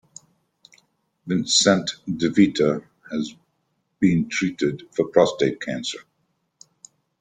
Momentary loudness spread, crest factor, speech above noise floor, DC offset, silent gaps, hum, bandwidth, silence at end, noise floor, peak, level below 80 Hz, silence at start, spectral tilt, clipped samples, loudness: 13 LU; 22 dB; 51 dB; under 0.1%; none; none; 9.6 kHz; 1.2 s; -72 dBFS; -2 dBFS; -60 dBFS; 1.25 s; -4 dB/octave; under 0.1%; -22 LUFS